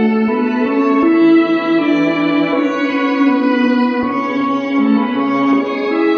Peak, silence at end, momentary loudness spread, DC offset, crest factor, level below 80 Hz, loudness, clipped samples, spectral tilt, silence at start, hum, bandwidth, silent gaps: -2 dBFS; 0 s; 5 LU; under 0.1%; 12 dB; -58 dBFS; -14 LUFS; under 0.1%; -7 dB/octave; 0 s; none; 6.4 kHz; none